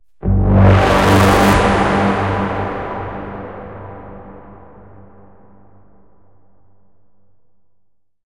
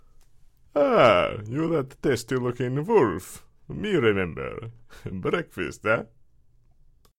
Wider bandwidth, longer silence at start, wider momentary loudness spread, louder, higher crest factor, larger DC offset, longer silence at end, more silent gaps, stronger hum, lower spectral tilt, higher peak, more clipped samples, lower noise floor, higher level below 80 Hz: about the same, 17 kHz vs 16.5 kHz; second, 0.25 s vs 0.75 s; about the same, 22 LU vs 21 LU; first, -14 LUFS vs -24 LUFS; about the same, 16 dB vs 20 dB; first, 0.6% vs under 0.1%; first, 3.7 s vs 1.15 s; neither; neither; about the same, -6.5 dB/octave vs -6 dB/octave; first, 0 dBFS vs -6 dBFS; neither; first, -62 dBFS vs -57 dBFS; first, -28 dBFS vs -52 dBFS